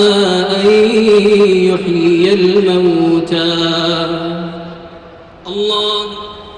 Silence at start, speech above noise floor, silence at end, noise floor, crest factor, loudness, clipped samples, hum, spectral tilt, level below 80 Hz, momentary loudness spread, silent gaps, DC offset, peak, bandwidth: 0 s; 25 dB; 0 s; -36 dBFS; 10 dB; -11 LUFS; under 0.1%; none; -5.5 dB/octave; -46 dBFS; 15 LU; none; under 0.1%; -2 dBFS; 10 kHz